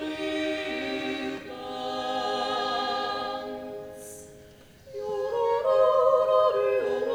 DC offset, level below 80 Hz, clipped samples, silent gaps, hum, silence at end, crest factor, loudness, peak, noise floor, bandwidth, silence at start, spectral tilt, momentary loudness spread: under 0.1%; -64 dBFS; under 0.1%; none; none; 0 s; 18 dB; -27 LUFS; -10 dBFS; -51 dBFS; over 20 kHz; 0 s; -4 dB/octave; 17 LU